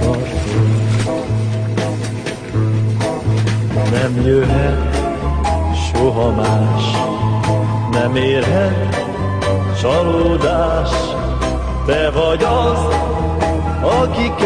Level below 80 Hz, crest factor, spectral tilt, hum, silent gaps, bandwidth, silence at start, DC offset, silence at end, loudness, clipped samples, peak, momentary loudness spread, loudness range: -24 dBFS; 14 dB; -6.5 dB/octave; none; none; 10.5 kHz; 0 s; under 0.1%; 0 s; -16 LUFS; under 0.1%; -2 dBFS; 5 LU; 2 LU